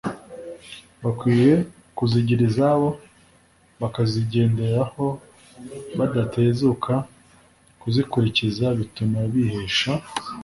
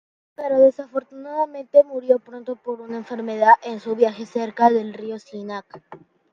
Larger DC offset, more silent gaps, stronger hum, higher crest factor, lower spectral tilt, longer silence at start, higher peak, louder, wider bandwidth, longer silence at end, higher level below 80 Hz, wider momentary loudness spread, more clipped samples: neither; neither; neither; about the same, 18 dB vs 20 dB; about the same, -7 dB/octave vs -6 dB/octave; second, 0.05 s vs 0.4 s; second, -6 dBFS vs -2 dBFS; about the same, -22 LUFS vs -20 LUFS; first, 11.5 kHz vs 7.2 kHz; second, 0 s vs 0.35 s; first, -50 dBFS vs -72 dBFS; first, 19 LU vs 16 LU; neither